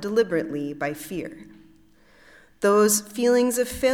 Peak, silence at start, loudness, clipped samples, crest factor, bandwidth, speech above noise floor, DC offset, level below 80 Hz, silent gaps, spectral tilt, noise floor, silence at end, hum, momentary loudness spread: -8 dBFS; 0 s; -23 LUFS; under 0.1%; 16 dB; 18 kHz; 32 dB; under 0.1%; -54 dBFS; none; -3.5 dB/octave; -55 dBFS; 0 s; none; 14 LU